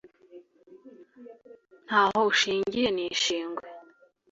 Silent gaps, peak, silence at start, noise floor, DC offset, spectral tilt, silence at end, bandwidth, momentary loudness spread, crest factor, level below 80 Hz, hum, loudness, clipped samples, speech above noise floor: none; -10 dBFS; 0.35 s; -59 dBFS; under 0.1%; -2.5 dB/octave; 0.5 s; 8 kHz; 15 LU; 20 dB; -66 dBFS; none; -25 LUFS; under 0.1%; 33 dB